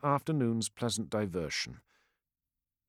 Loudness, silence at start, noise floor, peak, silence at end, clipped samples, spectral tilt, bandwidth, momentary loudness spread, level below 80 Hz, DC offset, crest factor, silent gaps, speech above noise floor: -33 LUFS; 0.05 s; under -90 dBFS; -16 dBFS; 1.1 s; under 0.1%; -5 dB/octave; 16 kHz; 5 LU; -66 dBFS; under 0.1%; 18 dB; none; over 57 dB